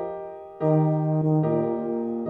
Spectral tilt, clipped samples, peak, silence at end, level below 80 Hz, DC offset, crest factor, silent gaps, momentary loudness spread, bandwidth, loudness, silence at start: -12.5 dB/octave; under 0.1%; -10 dBFS; 0 s; -64 dBFS; under 0.1%; 14 dB; none; 12 LU; 2.9 kHz; -24 LUFS; 0 s